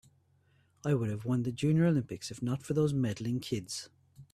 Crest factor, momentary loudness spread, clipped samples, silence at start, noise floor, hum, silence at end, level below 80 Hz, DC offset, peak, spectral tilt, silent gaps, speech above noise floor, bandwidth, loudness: 14 dB; 12 LU; under 0.1%; 0.85 s; -68 dBFS; none; 0.1 s; -64 dBFS; under 0.1%; -18 dBFS; -6.5 dB/octave; none; 37 dB; 13.5 kHz; -32 LUFS